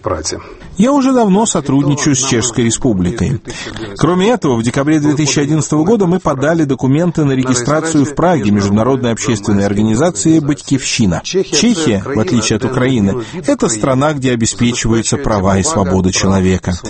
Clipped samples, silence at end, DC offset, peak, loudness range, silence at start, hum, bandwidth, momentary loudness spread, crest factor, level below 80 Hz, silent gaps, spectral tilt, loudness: under 0.1%; 0 s; under 0.1%; 0 dBFS; 1 LU; 0.05 s; none; 8.8 kHz; 4 LU; 12 dB; -34 dBFS; none; -5 dB/octave; -13 LUFS